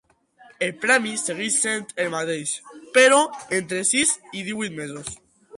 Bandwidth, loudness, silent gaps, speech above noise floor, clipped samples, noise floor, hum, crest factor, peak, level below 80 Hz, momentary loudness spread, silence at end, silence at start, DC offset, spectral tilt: 11.5 kHz; -21 LUFS; none; 31 dB; under 0.1%; -53 dBFS; none; 18 dB; -4 dBFS; -64 dBFS; 15 LU; 0 s; 0.6 s; under 0.1%; -2 dB/octave